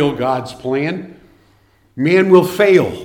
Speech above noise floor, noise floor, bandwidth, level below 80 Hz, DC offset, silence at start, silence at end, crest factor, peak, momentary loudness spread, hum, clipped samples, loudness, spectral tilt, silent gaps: 40 dB; -54 dBFS; 17 kHz; -52 dBFS; under 0.1%; 0 s; 0 s; 16 dB; 0 dBFS; 11 LU; none; under 0.1%; -14 LUFS; -6.5 dB/octave; none